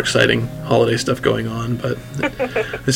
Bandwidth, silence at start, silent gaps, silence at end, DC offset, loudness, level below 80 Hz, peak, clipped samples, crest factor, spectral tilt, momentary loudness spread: 16.5 kHz; 0 s; none; 0 s; under 0.1%; -19 LUFS; -42 dBFS; 0 dBFS; under 0.1%; 18 dB; -5 dB/octave; 8 LU